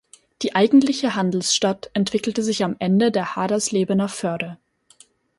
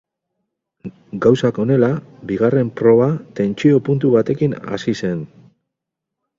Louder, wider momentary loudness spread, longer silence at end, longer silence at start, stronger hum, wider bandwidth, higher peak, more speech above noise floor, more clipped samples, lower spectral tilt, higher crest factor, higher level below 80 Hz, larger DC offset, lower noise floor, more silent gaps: second, -20 LUFS vs -17 LUFS; second, 10 LU vs 14 LU; second, 0.85 s vs 1.15 s; second, 0.4 s vs 0.85 s; neither; first, 11.5 kHz vs 7.6 kHz; second, -4 dBFS vs 0 dBFS; second, 34 dB vs 65 dB; neither; second, -4.5 dB/octave vs -8 dB/octave; about the same, 16 dB vs 18 dB; second, -62 dBFS vs -54 dBFS; neither; second, -54 dBFS vs -81 dBFS; neither